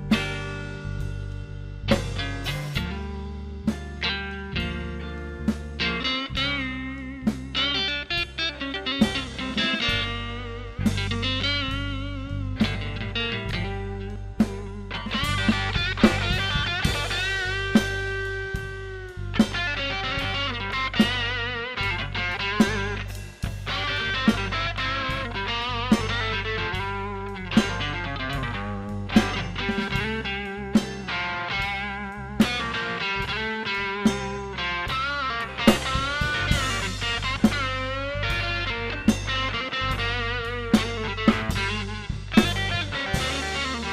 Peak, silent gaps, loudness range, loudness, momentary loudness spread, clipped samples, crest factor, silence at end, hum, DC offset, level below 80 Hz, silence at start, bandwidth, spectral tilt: 0 dBFS; none; 4 LU; -26 LUFS; 10 LU; under 0.1%; 26 dB; 0 s; none; under 0.1%; -36 dBFS; 0 s; 15 kHz; -4.5 dB/octave